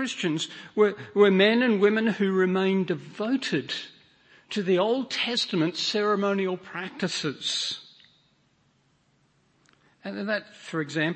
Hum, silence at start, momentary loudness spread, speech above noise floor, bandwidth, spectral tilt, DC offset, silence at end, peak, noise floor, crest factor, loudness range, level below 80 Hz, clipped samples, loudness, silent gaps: none; 0 s; 13 LU; 41 dB; 8.8 kHz; -5 dB/octave; under 0.1%; 0 s; -8 dBFS; -67 dBFS; 18 dB; 11 LU; -76 dBFS; under 0.1%; -25 LUFS; none